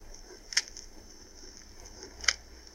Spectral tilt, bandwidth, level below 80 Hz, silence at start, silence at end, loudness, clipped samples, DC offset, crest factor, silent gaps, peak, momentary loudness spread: 1 dB/octave; 16.5 kHz; -52 dBFS; 0 s; 0 s; -31 LUFS; under 0.1%; under 0.1%; 32 dB; none; -6 dBFS; 21 LU